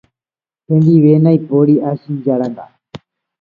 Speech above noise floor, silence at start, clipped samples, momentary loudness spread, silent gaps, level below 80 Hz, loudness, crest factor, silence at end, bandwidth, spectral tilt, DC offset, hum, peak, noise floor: over 79 dB; 0.7 s; under 0.1%; 11 LU; none; -60 dBFS; -13 LUFS; 14 dB; 0.45 s; 4.7 kHz; -11.5 dB/octave; under 0.1%; none; 0 dBFS; under -90 dBFS